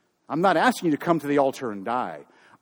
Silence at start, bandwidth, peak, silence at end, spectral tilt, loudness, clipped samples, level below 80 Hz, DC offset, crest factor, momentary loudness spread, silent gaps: 0.3 s; over 20 kHz; -6 dBFS; 0.4 s; -5.5 dB/octave; -24 LUFS; under 0.1%; -72 dBFS; under 0.1%; 18 dB; 12 LU; none